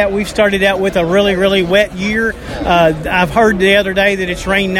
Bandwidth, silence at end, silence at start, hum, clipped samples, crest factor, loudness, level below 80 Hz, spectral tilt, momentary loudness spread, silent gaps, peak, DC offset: 16.5 kHz; 0 s; 0 s; none; under 0.1%; 12 dB; -12 LUFS; -32 dBFS; -5 dB/octave; 5 LU; none; 0 dBFS; under 0.1%